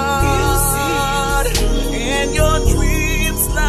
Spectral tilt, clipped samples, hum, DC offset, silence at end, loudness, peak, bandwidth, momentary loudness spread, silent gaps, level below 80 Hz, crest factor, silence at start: -4 dB/octave; under 0.1%; none; under 0.1%; 0 s; -16 LUFS; -2 dBFS; 14.5 kHz; 3 LU; none; -20 dBFS; 14 dB; 0 s